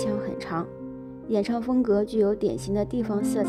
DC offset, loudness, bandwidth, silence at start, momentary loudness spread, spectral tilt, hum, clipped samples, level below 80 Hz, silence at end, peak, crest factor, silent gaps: under 0.1%; -26 LUFS; 14 kHz; 0 s; 13 LU; -7 dB/octave; none; under 0.1%; -50 dBFS; 0 s; -12 dBFS; 14 dB; none